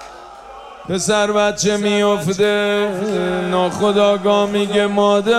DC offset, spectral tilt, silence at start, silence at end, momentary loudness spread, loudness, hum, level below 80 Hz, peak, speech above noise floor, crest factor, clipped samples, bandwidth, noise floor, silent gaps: under 0.1%; -4.5 dB/octave; 0 s; 0 s; 20 LU; -16 LUFS; none; -50 dBFS; -4 dBFS; 21 dB; 14 dB; under 0.1%; 14 kHz; -36 dBFS; none